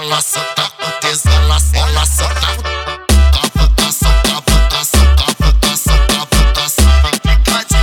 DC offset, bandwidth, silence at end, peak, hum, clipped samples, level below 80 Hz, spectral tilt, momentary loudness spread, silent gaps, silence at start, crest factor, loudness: under 0.1%; 18.5 kHz; 0 s; 0 dBFS; none; under 0.1%; -12 dBFS; -3.5 dB/octave; 5 LU; none; 0 s; 10 dB; -12 LUFS